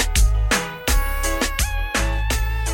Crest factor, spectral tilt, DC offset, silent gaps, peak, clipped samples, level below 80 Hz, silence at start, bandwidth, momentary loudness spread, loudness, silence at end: 14 dB; -3 dB/octave; under 0.1%; none; -6 dBFS; under 0.1%; -20 dBFS; 0 s; 17 kHz; 4 LU; -21 LUFS; 0 s